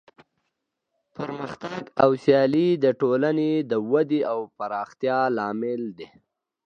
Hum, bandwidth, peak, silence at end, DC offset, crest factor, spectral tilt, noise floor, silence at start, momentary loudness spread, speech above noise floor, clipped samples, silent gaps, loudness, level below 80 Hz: none; 7.4 kHz; -2 dBFS; 0.65 s; under 0.1%; 22 dB; -8 dB/octave; -79 dBFS; 1.2 s; 14 LU; 56 dB; under 0.1%; none; -23 LUFS; -70 dBFS